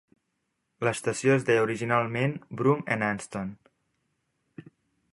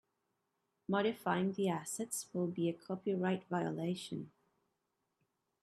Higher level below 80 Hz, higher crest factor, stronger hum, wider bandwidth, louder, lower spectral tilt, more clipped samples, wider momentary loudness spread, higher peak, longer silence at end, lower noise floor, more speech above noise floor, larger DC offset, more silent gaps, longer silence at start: first, -66 dBFS vs -82 dBFS; about the same, 22 dB vs 20 dB; neither; second, 11.5 kHz vs 13.5 kHz; first, -27 LUFS vs -38 LUFS; about the same, -6 dB/octave vs -5.5 dB/octave; neither; about the same, 10 LU vs 8 LU; first, -8 dBFS vs -20 dBFS; second, 0.5 s vs 1.35 s; second, -79 dBFS vs -85 dBFS; first, 52 dB vs 48 dB; neither; neither; about the same, 0.8 s vs 0.9 s